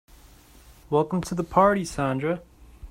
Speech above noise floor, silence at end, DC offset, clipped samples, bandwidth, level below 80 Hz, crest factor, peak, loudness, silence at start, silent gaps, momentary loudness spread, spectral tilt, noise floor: 28 dB; 0 s; under 0.1%; under 0.1%; 16 kHz; -48 dBFS; 22 dB; -4 dBFS; -24 LUFS; 0.9 s; none; 8 LU; -6.5 dB/octave; -51 dBFS